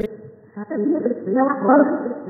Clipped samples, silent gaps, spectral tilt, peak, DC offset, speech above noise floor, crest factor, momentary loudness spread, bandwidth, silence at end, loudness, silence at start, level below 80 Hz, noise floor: under 0.1%; none; -10.5 dB/octave; -2 dBFS; under 0.1%; 21 dB; 18 dB; 17 LU; 4 kHz; 0 s; -19 LUFS; 0 s; -60 dBFS; -40 dBFS